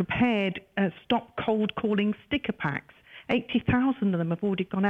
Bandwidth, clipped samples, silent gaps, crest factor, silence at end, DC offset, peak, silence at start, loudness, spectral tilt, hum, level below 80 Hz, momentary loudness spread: 5.2 kHz; under 0.1%; none; 14 dB; 0 s; under 0.1%; -12 dBFS; 0 s; -28 LUFS; -8.5 dB/octave; none; -54 dBFS; 6 LU